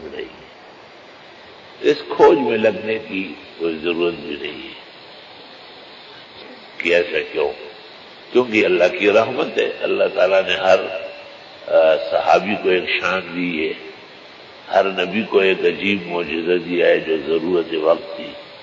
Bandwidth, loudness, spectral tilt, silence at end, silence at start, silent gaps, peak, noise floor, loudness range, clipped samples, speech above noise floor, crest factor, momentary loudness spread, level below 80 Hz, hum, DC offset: 7.6 kHz; -18 LUFS; -5 dB/octave; 0 s; 0 s; none; -2 dBFS; -42 dBFS; 8 LU; under 0.1%; 24 dB; 18 dB; 23 LU; -58 dBFS; none; under 0.1%